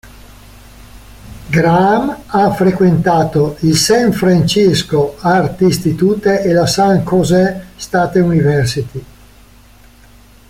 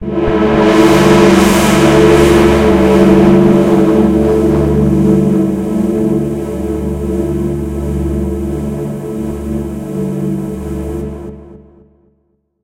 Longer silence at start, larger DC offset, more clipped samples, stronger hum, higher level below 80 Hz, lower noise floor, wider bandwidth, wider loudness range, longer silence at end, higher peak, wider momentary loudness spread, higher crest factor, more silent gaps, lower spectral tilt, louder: about the same, 0.05 s vs 0 s; neither; second, under 0.1% vs 0.3%; neither; second, -40 dBFS vs -26 dBFS; second, -42 dBFS vs -60 dBFS; about the same, 16 kHz vs 16 kHz; second, 3 LU vs 12 LU; first, 1.45 s vs 1.05 s; about the same, -2 dBFS vs 0 dBFS; second, 7 LU vs 13 LU; about the same, 12 dB vs 12 dB; neither; about the same, -5.5 dB/octave vs -6.5 dB/octave; about the same, -12 LUFS vs -11 LUFS